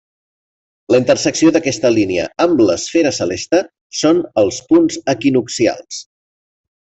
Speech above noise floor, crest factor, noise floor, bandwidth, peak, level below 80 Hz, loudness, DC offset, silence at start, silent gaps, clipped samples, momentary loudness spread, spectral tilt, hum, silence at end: over 76 dB; 14 dB; under -90 dBFS; 8.2 kHz; -2 dBFS; -52 dBFS; -15 LUFS; under 0.1%; 0.9 s; 3.81-3.90 s; under 0.1%; 5 LU; -4.5 dB/octave; none; 0.95 s